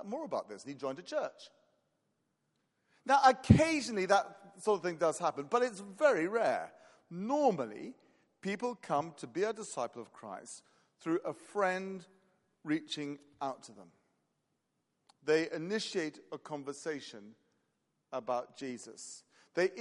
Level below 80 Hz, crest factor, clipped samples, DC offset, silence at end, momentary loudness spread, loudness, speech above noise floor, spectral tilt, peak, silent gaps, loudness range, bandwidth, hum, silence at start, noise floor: -64 dBFS; 28 dB; under 0.1%; under 0.1%; 0 s; 18 LU; -34 LUFS; 48 dB; -5.5 dB/octave; -6 dBFS; none; 11 LU; 11.5 kHz; none; 0 s; -82 dBFS